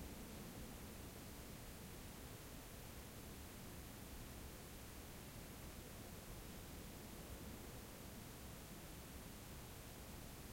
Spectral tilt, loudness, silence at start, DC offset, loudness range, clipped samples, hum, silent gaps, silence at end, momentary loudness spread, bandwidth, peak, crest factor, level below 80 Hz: -4 dB/octave; -55 LUFS; 0 s; under 0.1%; 0 LU; under 0.1%; none; none; 0 s; 1 LU; 16.5 kHz; -40 dBFS; 14 dB; -60 dBFS